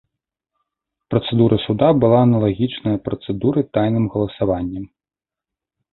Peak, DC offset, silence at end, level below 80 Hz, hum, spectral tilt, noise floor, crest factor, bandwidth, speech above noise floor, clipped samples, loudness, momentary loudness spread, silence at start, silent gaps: -2 dBFS; under 0.1%; 1.05 s; -46 dBFS; none; -12.5 dB/octave; -90 dBFS; 18 dB; 4.2 kHz; 72 dB; under 0.1%; -18 LUFS; 10 LU; 1.1 s; none